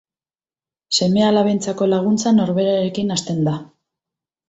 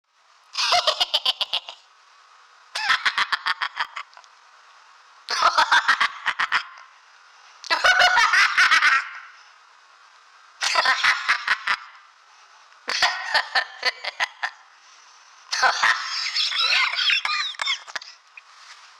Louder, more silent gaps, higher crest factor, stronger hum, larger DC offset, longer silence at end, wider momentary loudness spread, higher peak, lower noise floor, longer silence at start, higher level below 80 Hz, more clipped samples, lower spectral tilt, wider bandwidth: about the same, -18 LUFS vs -20 LUFS; neither; about the same, 14 dB vs 16 dB; neither; neither; first, 0.85 s vs 0.25 s; second, 6 LU vs 16 LU; first, -4 dBFS vs -8 dBFS; first, under -90 dBFS vs -56 dBFS; first, 0.9 s vs 0.55 s; first, -58 dBFS vs -66 dBFS; neither; first, -5.5 dB/octave vs 2 dB/octave; second, 8.2 kHz vs 17.5 kHz